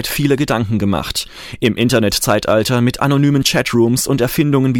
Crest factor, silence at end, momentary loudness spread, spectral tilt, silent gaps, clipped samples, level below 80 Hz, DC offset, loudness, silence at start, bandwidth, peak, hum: 14 dB; 0 s; 5 LU; -5 dB/octave; none; under 0.1%; -38 dBFS; under 0.1%; -15 LUFS; 0 s; 17 kHz; 0 dBFS; none